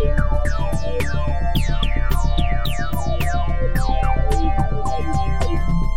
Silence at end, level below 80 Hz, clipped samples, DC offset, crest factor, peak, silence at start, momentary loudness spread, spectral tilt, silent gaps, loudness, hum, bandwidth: 0 s; -20 dBFS; under 0.1%; 9%; 14 dB; -6 dBFS; 0 s; 3 LU; -6 dB/octave; none; -22 LUFS; none; 16 kHz